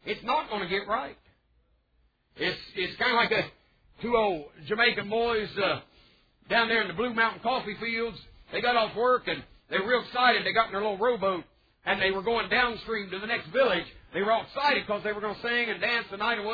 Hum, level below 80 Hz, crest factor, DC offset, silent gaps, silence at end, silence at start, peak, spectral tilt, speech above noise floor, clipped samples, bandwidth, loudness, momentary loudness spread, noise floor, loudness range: none; -58 dBFS; 20 dB; under 0.1%; none; 0 s; 0.05 s; -10 dBFS; -6 dB/octave; 41 dB; under 0.1%; 5 kHz; -27 LUFS; 9 LU; -69 dBFS; 3 LU